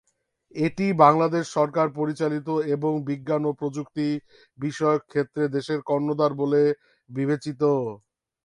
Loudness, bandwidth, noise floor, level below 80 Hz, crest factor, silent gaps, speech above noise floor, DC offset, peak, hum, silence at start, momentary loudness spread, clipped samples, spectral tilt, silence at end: -24 LUFS; 11 kHz; -63 dBFS; -68 dBFS; 22 dB; none; 39 dB; under 0.1%; -2 dBFS; none; 0.55 s; 10 LU; under 0.1%; -7 dB/octave; 0.5 s